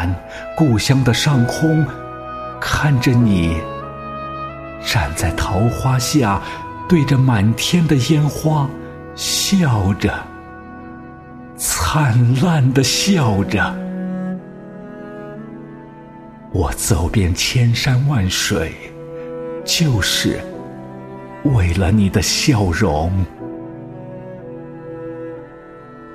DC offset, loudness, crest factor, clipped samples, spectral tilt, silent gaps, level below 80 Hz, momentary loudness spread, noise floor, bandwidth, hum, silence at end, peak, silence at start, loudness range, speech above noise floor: under 0.1%; -17 LUFS; 16 dB; under 0.1%; -5 dB/octave; none; -34 dBFS; 20 LU; -37 dBFS; 15.5 kHz; none; 0 s; -2 dBFS; 0 s; 5 LU; 22 dB